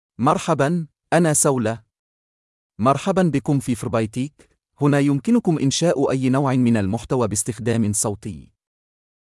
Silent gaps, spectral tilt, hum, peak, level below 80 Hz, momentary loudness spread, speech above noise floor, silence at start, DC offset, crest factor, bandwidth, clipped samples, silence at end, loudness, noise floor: 1.99-2.70 s; -5.5 dB/octave; none; -4 dBFS; -54 dBFS; 9 LU; over 71 dB; 0.2 s; under 0.1%; 16 dB; 12 kHz; under 0.1%; 0.95 s; -20 LUFS; under -90 dBFS